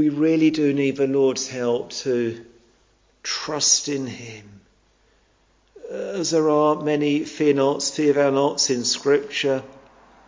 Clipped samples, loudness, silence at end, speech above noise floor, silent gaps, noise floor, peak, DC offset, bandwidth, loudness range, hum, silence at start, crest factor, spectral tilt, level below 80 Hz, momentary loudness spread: under 0.1%; -21 LUFS; 0.55 s; 40 dB; none; -61 dBFS; -4 dBFS; under 0.1%; 7.8 kHz; 5 LU; none; 0 s; 18 dB; -3.5 dB/octave; -64 dBFS; 12 LU